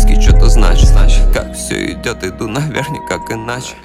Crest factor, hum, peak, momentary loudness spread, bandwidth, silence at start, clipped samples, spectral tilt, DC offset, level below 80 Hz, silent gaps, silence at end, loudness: 10 dB; none; 0 dBFS; 10 LU; 12.5 kHz; 0 s; under 0.1%; -5 dB/octave; under 0.1%; -10 dBFS; none; 0.1 s; -15 LUFS